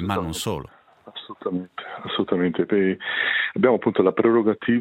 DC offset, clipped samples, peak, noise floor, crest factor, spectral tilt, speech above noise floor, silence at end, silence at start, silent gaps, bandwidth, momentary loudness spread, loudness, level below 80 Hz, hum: under 0.1%; under 0.1%; -4 dBFS; -42 dBFS; 18 dB; -5.5 dB/octave; 21 dB; 0 s; 0 s; none; 16 kHz; 15 LU; -22 LUFS; -56 dBFS; none